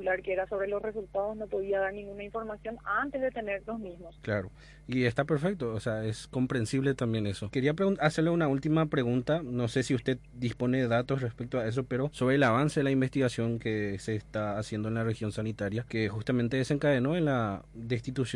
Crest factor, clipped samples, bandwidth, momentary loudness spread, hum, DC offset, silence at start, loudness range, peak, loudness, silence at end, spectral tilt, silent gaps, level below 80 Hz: 16 dB; under 0.1%; 11.5 kHz; 8 LU; none; under 0.1%; 0 s; 5 LU; -14 dBFS; -31 LUFS; 0 s; -7 dB/octave; none; -56 dBFS